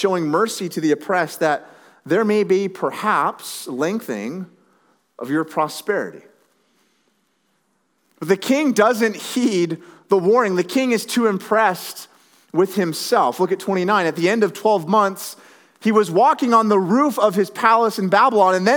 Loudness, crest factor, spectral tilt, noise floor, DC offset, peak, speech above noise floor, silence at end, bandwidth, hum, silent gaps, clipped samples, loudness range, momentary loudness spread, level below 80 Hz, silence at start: -18 LUFS; 18 dB; -5 dB/octave; -66 dBFS; under 0.1%; 0 dBFS; 48 dB; 0 s; over 20 kHz; none; none; under 0.1%; 9 LU; 11 LU; -86 dBFS; 0 s